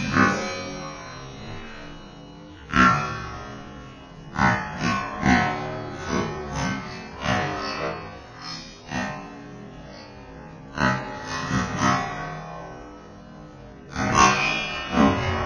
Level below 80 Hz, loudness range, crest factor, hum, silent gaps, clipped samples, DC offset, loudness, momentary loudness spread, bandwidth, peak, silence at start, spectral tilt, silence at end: -44 dBFS; 7 LU; 24 dB; none; none; under 0.1%; under 0.1%; -24 LUFS; 22 LU; 10.5 kHz; -2 dBFS; 0 s; -4.5 dB/octave; 0 s